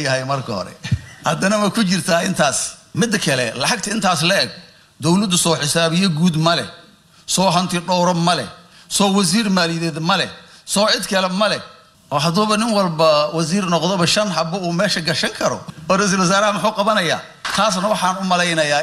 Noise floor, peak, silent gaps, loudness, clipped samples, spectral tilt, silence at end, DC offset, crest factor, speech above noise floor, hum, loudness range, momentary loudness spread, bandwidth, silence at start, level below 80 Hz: -45 dBFS; -2 dBFS; none; -17 LUFS; under 0.1%; -4 dB/octave; 0 s; under 0.1%; 16 dB; 28 dB; none; 1 LU; 8 LU; 15 kHz; 0 s; -52 dBFS